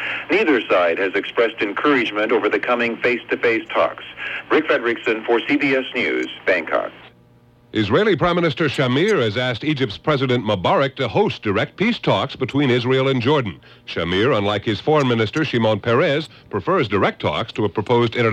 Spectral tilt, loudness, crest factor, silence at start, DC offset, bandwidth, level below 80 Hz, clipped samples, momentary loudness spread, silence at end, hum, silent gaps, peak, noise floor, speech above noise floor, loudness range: -6.5 dB/octave; -19 LUFS; 14 dB; 0 s; under 0.1%; 9.4 kHz; -54 dBFS; under 0.1%; 6 LU; 0 s; none; none; -4 dBFS; -51 dBFS; 33 dB; 1 LU